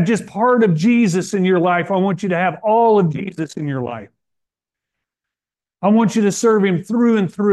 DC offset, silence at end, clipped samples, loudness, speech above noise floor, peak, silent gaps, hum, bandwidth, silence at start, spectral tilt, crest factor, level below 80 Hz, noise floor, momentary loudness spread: under 0.1%; 0 s; under 0.1%; -16 LUFS; 74 dB; -4 dBFS; none; none; 12.5 kHz; 0 s; -6.5 dB/octave; 12 dB; -64 dBFS; -89 dBFS; 10 LU